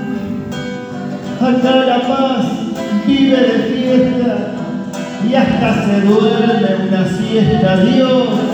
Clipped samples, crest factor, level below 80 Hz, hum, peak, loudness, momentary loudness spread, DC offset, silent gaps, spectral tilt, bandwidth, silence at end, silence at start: under 0.1%; 14 dB; -44 dBFS; none; 0 dBFS; -14 LUFS; 11 LU; under 0.1%; none; -7 dB/octave; 8.6 kHz; 0 s; 0 s